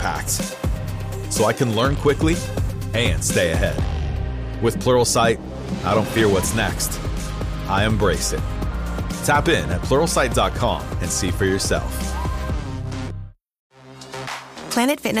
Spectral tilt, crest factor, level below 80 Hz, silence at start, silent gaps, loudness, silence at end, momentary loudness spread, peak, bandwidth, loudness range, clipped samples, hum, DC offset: -4.5 dB/octave; 16 dB; -30 dBFS; 0 s; 13.59-13.70 s; -21 LUFS; 0 s; 11 LU; -6 dBFS; 15.5 kHz; 5 LU; under 0.1%; none; under 0.1%